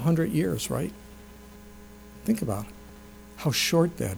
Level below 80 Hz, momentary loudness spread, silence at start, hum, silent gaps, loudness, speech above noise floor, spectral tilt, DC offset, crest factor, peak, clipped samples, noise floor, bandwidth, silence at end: -50 dBFS; 24 LU; 0 s; 60 Hz at -50 dBFS; none; -27 LUFS; 21 dB; -5 dB/octave; under 0.1%; 18 dB; -10 dBFS; under 0.1%; -47 dBFS; over 20 kHz; 0 s